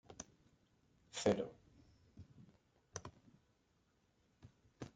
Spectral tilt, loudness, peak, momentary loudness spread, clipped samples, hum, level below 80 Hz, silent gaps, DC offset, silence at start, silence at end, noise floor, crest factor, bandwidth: -4.5 dB/octave; -43 LUFS; -22 dBFS; 26 LU; under 0.1%; none; -74 dBFS; none; under 0.1%; 0.1 s; 0.05 s; -78 dBFS; 26 dB; 9 kHz